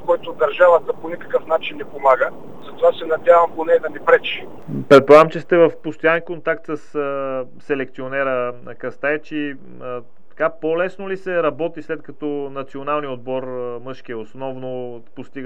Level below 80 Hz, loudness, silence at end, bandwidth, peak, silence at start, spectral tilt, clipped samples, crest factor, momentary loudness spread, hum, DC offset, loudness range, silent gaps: -60 dBFS; -18 LUFS; 0 s; 8.8 kHz; 0 dBFS; 0 s; -6.5 dB/octave; under 0.1%; 20 dB; 17 LU; none; 2%; 10 LU; none